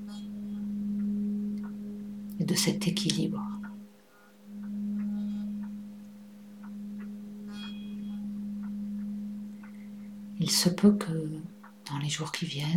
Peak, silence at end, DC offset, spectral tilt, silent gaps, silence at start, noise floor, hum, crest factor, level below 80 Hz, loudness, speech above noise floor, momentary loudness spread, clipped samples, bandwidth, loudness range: -10 dBFS; 0 s; under 0.1%; -4.5 dB/octave; none; 0 s; -58 dBFS; none; 22 dB; -64 dBFS; -32 LUFS; 29 dB; 18 LU; under 0.1%; 17 kHz; 9 LU